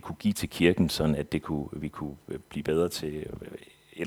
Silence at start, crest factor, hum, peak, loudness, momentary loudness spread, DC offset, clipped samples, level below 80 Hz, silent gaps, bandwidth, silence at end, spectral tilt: 0.05 s; 24 dB; none; -6 dBFS; -29 LUFS; 17 LU; under 0.1%; under 0.1%; -50 dBFS; none; 20 kHz; 0 s; -5.5 dB/octave